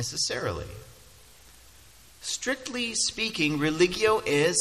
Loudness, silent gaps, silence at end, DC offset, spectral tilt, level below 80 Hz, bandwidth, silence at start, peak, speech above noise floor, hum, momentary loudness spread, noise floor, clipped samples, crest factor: -26 LUFS; none; 0 s; under 0.1%; -3 dB/octave; -52 dBFS; 14 kHz; 0 s; -8 dBFS; 27 dB; none; 14 LU; -54 dBFS; under 0.1%; 20 dB